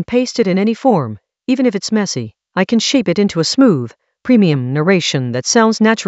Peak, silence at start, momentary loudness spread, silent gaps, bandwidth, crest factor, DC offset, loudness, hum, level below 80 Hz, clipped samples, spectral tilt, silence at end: 0 dBFS; 0 s; 9 LU; none; 8.2 kHz; 14 dB; under 0.1%; -14 LUFS; none; -56 dBFS; under 0.1%; -5 dB/octave; 0 s